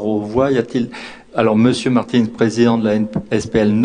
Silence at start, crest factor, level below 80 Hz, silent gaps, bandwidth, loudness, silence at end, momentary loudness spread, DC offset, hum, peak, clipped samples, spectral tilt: 0 s; 16 dB; -44 dBFS; none; 10 kHz; -16 LUFS; 0 s; 8 LU; under 0.1%; none; 0 dBFS; under 0.1%; -6.5 dB/octave